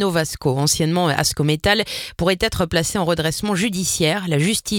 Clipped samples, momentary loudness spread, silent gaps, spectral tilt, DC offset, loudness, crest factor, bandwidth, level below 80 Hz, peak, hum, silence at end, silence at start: under 0.1%; 3 LU; none; -4 dB/octave; under 0.1%; -19 LUFS; 18 dB; 18 kHz; -40 dBFS; -2 dBFS; none; 0 s; 0 s